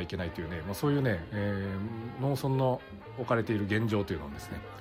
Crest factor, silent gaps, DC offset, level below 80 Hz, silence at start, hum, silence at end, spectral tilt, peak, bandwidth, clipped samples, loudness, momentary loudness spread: 16 dB; none; under 0.1%; -52 dBFS; 0 s; none; 0 s; -7 dB/octave; -14 dBFS; 16 kHz; under 0.1%; -32 LUFS; 11 LU